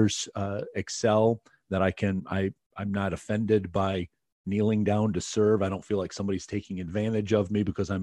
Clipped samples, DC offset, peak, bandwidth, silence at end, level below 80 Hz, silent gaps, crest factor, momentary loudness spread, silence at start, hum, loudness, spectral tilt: under 0.1%; under 0.1%; -10 dBFS; 11 kHz; 0 s; -56 dBFS; 2.66-2.70 s, 4.32-4.44 s; 18 dB; 9 LU; 0 s; none; -28 LUFS; -6 dB/octave